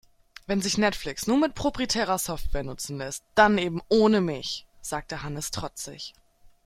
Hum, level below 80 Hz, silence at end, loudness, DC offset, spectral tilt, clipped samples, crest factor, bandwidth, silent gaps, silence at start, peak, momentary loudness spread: none; -44 dBFS; 0.2 s; -26 LUFS; under 0.1%; -4 dB/octave; under 0.1%; 22 dB; 16.5 kHz; none; 0.5 s; -4 dBFS; 14 LU